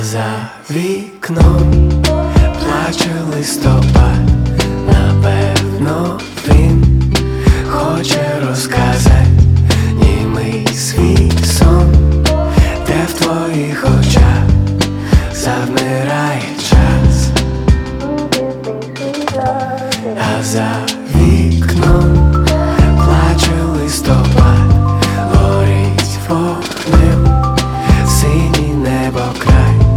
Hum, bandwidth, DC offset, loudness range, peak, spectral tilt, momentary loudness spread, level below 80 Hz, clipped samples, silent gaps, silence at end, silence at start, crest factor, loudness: none; 15.5 kHz; under 0.1%; 3 LU; 0 dBFS; -6 dB/octave; 8 LU; -16 dBFS; under 0.1%; none; 0 s; 0 s; 10 dB; -12 LUFS